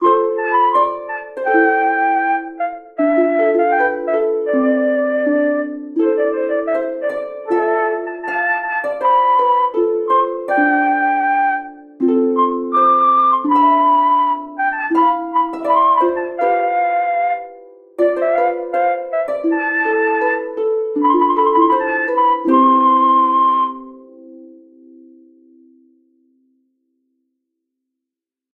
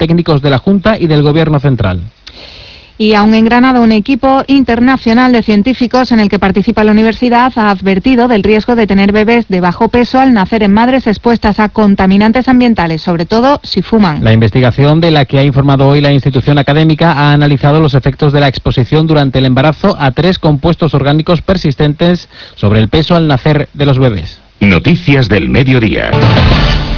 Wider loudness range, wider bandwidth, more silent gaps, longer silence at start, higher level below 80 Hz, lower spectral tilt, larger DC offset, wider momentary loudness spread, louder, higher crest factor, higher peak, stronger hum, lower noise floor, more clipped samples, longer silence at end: about the same, 4 LU vs 2 LU; second, 4.5 kHz vs 5.4 kHz; neither; about the same, 0 s vs 0 s; second, -64 dBFS vs -26 dBFS; second, -6 dB/octave vs -8 dB/octave; neither; first, 8 LU vs 4 LU; second, -16 LUFS vs -8 LUFS; first, 14 dB vs 8 dB; about the same, -2 dBFS vs 0 dBFS; neither; first, -85 dBFS vs -33 dBFS; second, under 0.1% vs 0.7%; first, 4.1 s vs 0 s